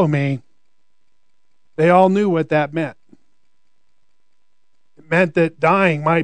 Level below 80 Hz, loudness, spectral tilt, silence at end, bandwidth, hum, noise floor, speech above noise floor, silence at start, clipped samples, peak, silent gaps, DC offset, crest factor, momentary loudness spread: -68 dBFS; -17 LUFS; -8 dB/octave; 0 s; 9.2 kHz; none; -74 dBFS; 58 dB; 0 s; under 0.1%; 0 dBFS; none; 0.4%; 18 dB; 12 LU